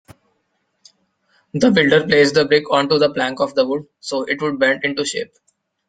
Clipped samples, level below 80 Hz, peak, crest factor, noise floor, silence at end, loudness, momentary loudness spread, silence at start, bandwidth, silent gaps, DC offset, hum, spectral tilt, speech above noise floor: under 0.1%; -58 dBFS; 0 dBFS; 18 dB; -69 dBFS; 0.65 s; -17 LUFS; 12 LU; 1.55 s; 9.4 kHz; none; under 0.1%; none; -4.5 dB/octave; 52 dB